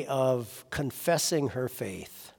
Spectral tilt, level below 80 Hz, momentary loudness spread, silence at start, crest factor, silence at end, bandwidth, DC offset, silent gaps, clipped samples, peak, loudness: -4.5 dB/octave; -60 dBFS; 11 LU; 0 s; 18 dB; 0.1 s; 18 kHz; under 0.1%; none; under 0.1%; -14 dBFS; -30 LUFS